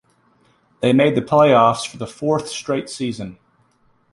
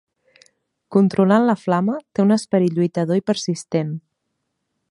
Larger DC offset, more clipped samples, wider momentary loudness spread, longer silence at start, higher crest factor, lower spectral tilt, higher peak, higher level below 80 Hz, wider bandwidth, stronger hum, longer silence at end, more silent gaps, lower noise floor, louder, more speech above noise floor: neither; neither; first, 14 LU vs 8 LU; about the same, 0.8 s vs 0.9 s; about the same, 18 dB vs 18 dB; second, -5.5 dB/octave vs -7 dB/octave; about the same, -2 dBFS vs -2 dBFS; first, -56 dBFS vs -66 dBFS; about the same, 11.5 kHz vs 11 kHz; neither; about the same, 0.8 s vs 0.9 s; neither; second, -60 dBFS vs -75 dBFS; about the same, -18 LUFS vs -19 LUFS; second, 42 dB vs 57 dB